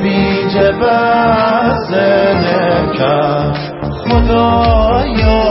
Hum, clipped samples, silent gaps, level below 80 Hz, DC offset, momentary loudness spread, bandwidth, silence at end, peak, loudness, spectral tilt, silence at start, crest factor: none; under 0.1%; none; -22 dBFS; under 0.1%; 4 LU; 5.8 kHz; 0 s; 0 dBFS; -12 LUFS; -11 dB/octave; 0 s; 12 dB